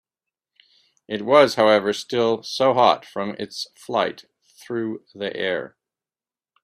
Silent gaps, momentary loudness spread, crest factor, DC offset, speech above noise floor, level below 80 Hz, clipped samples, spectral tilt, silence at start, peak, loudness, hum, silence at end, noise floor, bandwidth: none; 15 LU; 22 dB; under 0.1%; over 69 dB; -66 dBFS; under 0.1%; -4.5 dB/octave; 1.1 s; 0 dBFS; -21 LUFS; none; 0.95 s; under -90 dBFS; 13.5 kHz